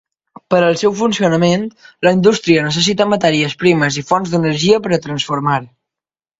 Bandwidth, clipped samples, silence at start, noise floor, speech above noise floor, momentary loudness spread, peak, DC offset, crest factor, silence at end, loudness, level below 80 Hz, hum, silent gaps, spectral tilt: 8 kHz; under 0.1%; 0.5 s; -88 dBFS; 74 dB; 6 LU; 0 dBFS; under 0.1%; 14 dB; 0.75 s; -14 LUFS; -52 dBFS; none; none; -5 dB/octave